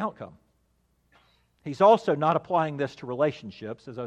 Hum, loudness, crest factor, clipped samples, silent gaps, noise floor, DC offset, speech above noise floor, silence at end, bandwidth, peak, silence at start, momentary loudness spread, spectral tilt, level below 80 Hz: none; -24 LUFS; 20 dB; under 0.1%; none; -69 dBFS; under 0.1%; 44 dB; 0 s; 9 kHz; -6 dBFS; 0 s; 21 LU; -7 dB/octave; -70 dBFS